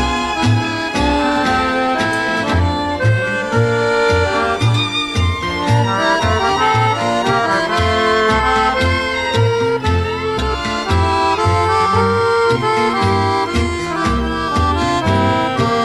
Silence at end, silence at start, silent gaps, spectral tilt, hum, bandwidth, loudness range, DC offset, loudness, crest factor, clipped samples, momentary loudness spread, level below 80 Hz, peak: 0 s; 0 s; none; -5.5 dB/octave; none; 12.5 kHz; 1 LU; under 0.1%; -15 LUFS; 14 dB; under 0.1%; 4 LU; -30 dBFS; -2 dBFS